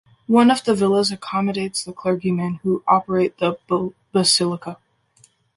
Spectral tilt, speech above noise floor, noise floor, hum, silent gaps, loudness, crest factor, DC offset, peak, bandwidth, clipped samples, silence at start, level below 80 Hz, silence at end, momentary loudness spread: -4.5 dB/octave; 38 dB; -57 dBFS; none; none; -19 LUFS; 18 dB; under 0.1%; -2 dBFS; 11.5 kHz; under 0.1%; 0.3 s; -60 dBFS; 0.8 s; 9 LU